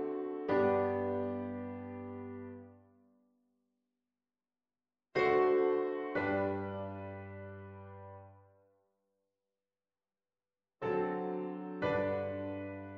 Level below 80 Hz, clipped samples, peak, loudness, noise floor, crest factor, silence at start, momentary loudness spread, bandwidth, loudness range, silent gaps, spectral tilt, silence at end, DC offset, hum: -74 dBFS; under 0.1%; -18 dBFS; -35 LUFS; under -90 dBFS; 18 dB; 0 s; 20 LU; 6 kHz; 17 LU; none; -8.5 dB/octave; 0 s; under 0.1%; none